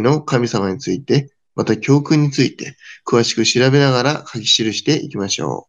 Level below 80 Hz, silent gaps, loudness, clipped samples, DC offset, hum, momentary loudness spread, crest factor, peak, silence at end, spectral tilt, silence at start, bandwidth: -60 dBFS; none; -16 LUFS; under 0.1%; under 0.1%; none; 9 LU; 16 dB; -2 dBFS; 0.1 s; -4.5 dB/octave; 0 s; 9.4 kHz